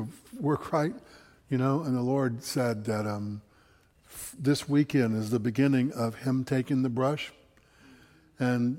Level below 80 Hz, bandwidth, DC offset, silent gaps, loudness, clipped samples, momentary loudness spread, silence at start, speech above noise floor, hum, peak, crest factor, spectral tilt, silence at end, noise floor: -64 dBFS; 16.5 kHz; under 0.1%; none; -29 LUFS; under 0.1%; 13 LU; 0 s; 34 dB; none; -12 dBFS; 16 dB; -6.5 dB/octave; 0 s; -62 dBFS